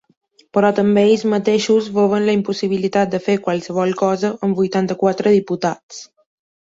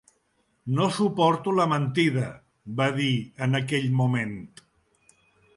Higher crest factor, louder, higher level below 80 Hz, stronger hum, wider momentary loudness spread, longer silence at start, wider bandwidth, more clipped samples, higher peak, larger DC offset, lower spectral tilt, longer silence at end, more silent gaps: about the same, 14 dB vs 18 dB; first, -17 LUFS vs -25 LUFS; about the same, -60 dBFS vs -64 dBFS; neither; second, 7 LU vs 12 LU; about the same, 0.55 s vs 0.65 s; second, 7.8 kHz vs 11.5 kHz; neither; first, -2 dBFS vs -8 dBFS; neither; about the same, -6 dB/octave vs -6.5 dB/octave; second, 0.6 s vs 1.1 s; first, 5.83-5.89 s vs none